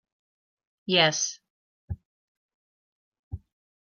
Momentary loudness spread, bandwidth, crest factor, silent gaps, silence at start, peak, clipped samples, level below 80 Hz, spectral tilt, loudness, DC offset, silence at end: 22 LU; 10.5 kHz; 24 dB; 1.50-1.88 s, 2.05-3.12 s, 3.19-3.31 s; 0.9 s; -8 dBFS; under 0.1%; -54 dBFS; -2.5 dB/octave; -23 LUFS; under 0.1%; 0.6 s